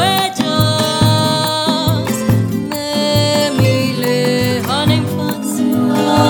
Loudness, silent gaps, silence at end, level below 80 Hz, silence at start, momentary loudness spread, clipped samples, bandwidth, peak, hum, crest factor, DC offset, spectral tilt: -15 LUFS; none; 0 s; -40 dBFS; 0 s; 5 LU; under 0.1%; over 20 kHz; 0 dBFS; none; 14 dB; under 0.1%; -5 dB/octave